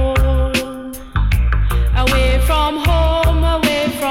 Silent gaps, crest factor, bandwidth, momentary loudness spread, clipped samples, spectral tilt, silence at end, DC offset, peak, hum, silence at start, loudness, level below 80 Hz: none; 8 dB; 16 kHz; 6 LU; under 0.1%; -5.5 dB/octave; 0 s; under 0.1%; -6 dBFS; none; 0 s; -16 LUFS; -16 dBFS